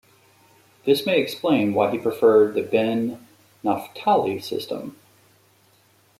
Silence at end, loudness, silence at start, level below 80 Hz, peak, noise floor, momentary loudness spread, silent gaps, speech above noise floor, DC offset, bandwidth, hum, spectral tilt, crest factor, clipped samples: 1.3 s; -22 LUFS; 0.85 s; -68 dBFS; -6 dBFS; -59 dBFS; 12 LU; none; 38 dB; under 0.1%; 15.5 kHz; none; -6 dB/octave; 18 dB; under 0.1%